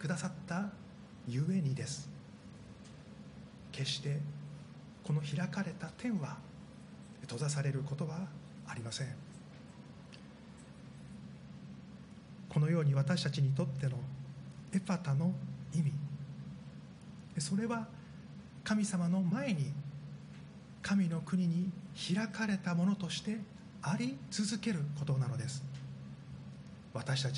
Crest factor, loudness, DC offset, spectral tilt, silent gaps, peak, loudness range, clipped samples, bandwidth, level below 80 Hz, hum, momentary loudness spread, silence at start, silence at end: 18 dB; -37 LUFS; under 0.1%; -6 dB/octave; none; -20 dBFS; 7 LU; under 0.1%; 10.5 kHz; -68 dBFS; none; 19 LU; 0 s; 0 s